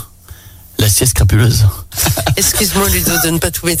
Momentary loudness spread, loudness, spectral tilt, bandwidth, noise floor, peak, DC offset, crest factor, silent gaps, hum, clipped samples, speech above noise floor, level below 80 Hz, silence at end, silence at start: 5 LU; -12 LUFS; -3.5 dB/octave; 16.5 kHz; -36 dBFS; 0 dBFS; under 0.1%; 12 dB; none; none; under 0.1%; 24 dB; -24 dBFS; 0 s; 0 s